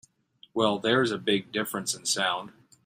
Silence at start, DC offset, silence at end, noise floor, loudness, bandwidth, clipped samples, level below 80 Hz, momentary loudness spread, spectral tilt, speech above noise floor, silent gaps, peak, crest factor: 0.55 s; under 0.1%; 0.35 s; -60 dBFS; -27 LUFS; 16 kHz; under 0.1%; -70 dBFS; 9 LU; -3 dB/octave; 32 dB; none; -10 dBFS; 18 dB